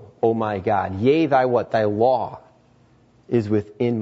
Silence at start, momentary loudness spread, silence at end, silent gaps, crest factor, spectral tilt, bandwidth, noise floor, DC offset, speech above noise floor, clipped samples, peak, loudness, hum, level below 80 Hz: 0 s; 7 LU; 0 s; none; 16 dB; -8.5 dB/octave; 7.8 kHz; -55 dBFS; under 0.1%; 36 dB; under 0.1%; -6 dBFS; -21 LUFS; none; -60 dBFS